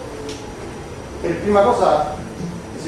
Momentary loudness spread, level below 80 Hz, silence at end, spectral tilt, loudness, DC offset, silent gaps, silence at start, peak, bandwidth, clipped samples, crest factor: 17 LU; -40 dBFS; 0 s; -6 dB/octave; -19 LUFS; under 0.1%; none; 0 s; -2 dBFS; 13 kHz; under 0.1%; 18 dB